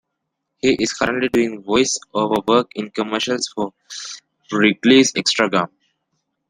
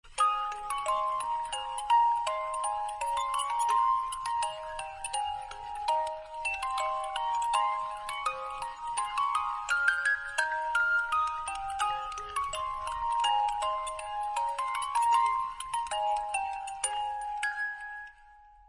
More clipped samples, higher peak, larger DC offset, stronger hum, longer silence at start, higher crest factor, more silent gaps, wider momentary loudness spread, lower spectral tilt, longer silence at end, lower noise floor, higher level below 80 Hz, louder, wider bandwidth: neither; first, 0 dBFS vs -12 dBFS; neither; neither; first, 0.65 s vs 0.05 s; about the same, 18 dB vs 20 dB; neither; first, 15 LU vs 9 LU; first, -3.5 dB/octave vs 1 dB/octave; first, 0.85 s vs 0.2 s; first, -77 dBFS vs -56 dBFS; about the same, -56 dBFS vs -58 dBFS; first, -18 LUFS vs -31 LUFS; first, 13 kHz vs 11.5 kHz